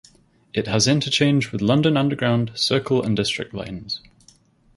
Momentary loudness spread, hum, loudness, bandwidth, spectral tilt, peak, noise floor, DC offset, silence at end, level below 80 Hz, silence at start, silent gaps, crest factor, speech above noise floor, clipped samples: 12 LU; none; -21 LUFS; 11.5 kHz; -5 dB/octave; -4 dBFS; -55 dBFS; under 0.1%; 0.8 s; -52 dBFS; 0.55 s; none; 18 dB; 35 dB; under 0.1%